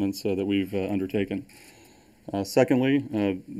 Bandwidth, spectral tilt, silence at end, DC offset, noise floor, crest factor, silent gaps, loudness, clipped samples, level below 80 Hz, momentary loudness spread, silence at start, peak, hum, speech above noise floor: 15.5 kHz; -6.5 dB/octave; 0 s; under 0.1%; -55 dBFS; 22 dB; none; -26 LUFS; under 0.1%; -62 dBFS; 11 LU; 0 s; -4 dBFS; none; 29 dB